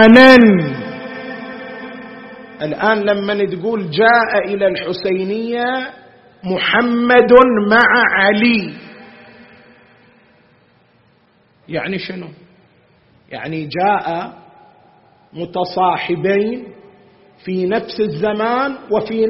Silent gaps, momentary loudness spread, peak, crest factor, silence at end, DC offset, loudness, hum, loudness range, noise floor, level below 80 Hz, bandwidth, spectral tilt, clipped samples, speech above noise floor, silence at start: none; 21 LU; 0 dBFS; 16 dB; 0 s; under 0.1%; -14 LUFS; none; 17 LU; -54 dBFS; -52 dBFS; 6 kHz; -3 dB/octave; 0.1%; 41 dB; 0 s